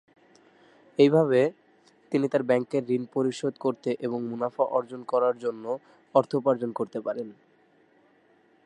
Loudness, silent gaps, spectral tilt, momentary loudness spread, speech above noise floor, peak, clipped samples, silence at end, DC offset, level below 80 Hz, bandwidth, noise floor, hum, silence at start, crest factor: -27 LUFS; none; -7 dB/octave; 12 LU; 37 dB; -6 dBFS; under 0.1%; 1.35 s; under 0.1%; -80 dBFS; 11 kHz; -62 dBFS; none; 1 s; 20 dB